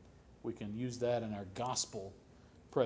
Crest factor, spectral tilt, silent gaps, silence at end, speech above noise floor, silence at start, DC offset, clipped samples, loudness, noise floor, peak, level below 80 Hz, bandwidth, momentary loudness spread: 22 dB; -4.5 dB/octave; none; 0 s; 20 dB; 0 s; under 0.1%; under 0.1%; -40 LUFS; -60 dBFS; -18 dBFS; -64 dBFS; 8 kHz; 11 LU